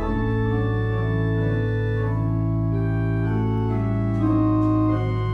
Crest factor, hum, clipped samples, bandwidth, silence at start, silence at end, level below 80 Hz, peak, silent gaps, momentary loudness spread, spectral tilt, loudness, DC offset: 12 dB; none; under 0.1%; 4.4 kHz; 0 s; 0 s; -34 dBFS; -10 dBFS; none; 4 LU; -10 dB/octave; -22 LUFS; under 0.1%